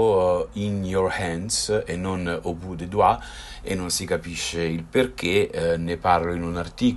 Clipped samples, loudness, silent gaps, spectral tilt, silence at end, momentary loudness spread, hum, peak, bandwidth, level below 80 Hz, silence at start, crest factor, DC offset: under 0.1%; -24 LUFS; none; -4.5 dB/octave; 0 s; 8 LU; none; -4 dBFS; 12.5 kHz; -44 dBFS; 0 s; 18 dB; under 0.1%